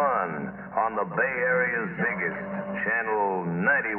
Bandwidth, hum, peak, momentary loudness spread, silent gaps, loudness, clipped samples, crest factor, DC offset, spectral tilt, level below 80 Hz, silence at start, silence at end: 3.3 kHz; none; -12 dBFS; 8 LU; none; -26 LUFS; under 0.1%; 16 dB; under 0.1%; -10.5 dB/octave; -62 dBFS; 0 s; 0 s